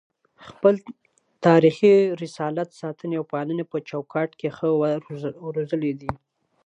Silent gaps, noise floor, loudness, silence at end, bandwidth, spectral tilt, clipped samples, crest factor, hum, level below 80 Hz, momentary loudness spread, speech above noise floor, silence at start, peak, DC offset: none; -48 dBFS; -23 LUFS; 0.5 s; 9.6 kHz; -7.5 dB/octave; under 0.1%; 20 dB; none; -60 dBFS; 15 LU; 26 dB; 0.4 s; -4 dBFS; under 0.1%